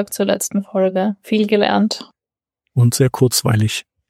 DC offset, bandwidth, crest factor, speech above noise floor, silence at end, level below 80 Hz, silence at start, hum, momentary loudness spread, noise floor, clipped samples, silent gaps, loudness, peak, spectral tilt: under 0.1%; 16.5 kHz; 16 dB; 74 dB; 0.3 s; -56 dBFS; 0 s; none; 6 LU; -90 dBFS; under 0.1%; none; -17 LUFS; -2 dBFS; -5 dB/octave